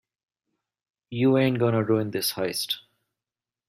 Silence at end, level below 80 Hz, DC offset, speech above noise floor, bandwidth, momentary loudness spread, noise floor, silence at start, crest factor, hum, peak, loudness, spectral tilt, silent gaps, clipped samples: 0.9 s; -66 dBFS; under 0.1%; over 66 dB; 16 kHz; 9 LU; under -90 dBFS; 1.1 s; 18 dB; none; -8 dBFS; -24 LUFS; -5.5 dB/octave; none; under 0.1%